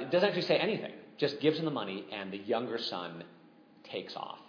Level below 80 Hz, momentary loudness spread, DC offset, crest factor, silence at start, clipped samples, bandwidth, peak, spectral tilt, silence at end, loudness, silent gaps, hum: -88 dBFS; 14 LU; under 0.1%; 22 dB; 0 s; under 0.1%; 5.4 kHz; -12 dBFS; -6.5 dB/octave; 0 s; -33 LUFS; none; none